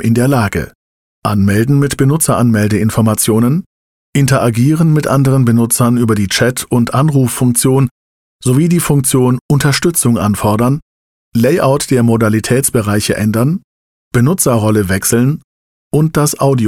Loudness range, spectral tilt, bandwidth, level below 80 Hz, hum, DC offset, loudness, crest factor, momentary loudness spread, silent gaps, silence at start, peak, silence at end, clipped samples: 2 LU; -5.5 dB/octave; 17 kHz; -40 dBFS; none; under 0.1%; -12 LUFS; 10 dB; 5 LU; 0.75-1.22 s, 3.66-4.13 s, 7.91-8.39 s, 9.41-9.49 s, 10.82-11.32 s, 13.64-14.11 s, 15.44-15.91 s; 0 s; -2 dBFS; 0 s; under 0.1%